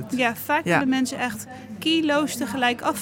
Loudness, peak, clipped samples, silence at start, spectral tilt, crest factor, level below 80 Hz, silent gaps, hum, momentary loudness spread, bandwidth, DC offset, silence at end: -23 LUFS; -6 dBFS; under 0.1%; 0 s; -4 dB/octave; 18 dB; -64 dBFS; none; none; 8 LU; 17 kHz; under 0.1%; 0 s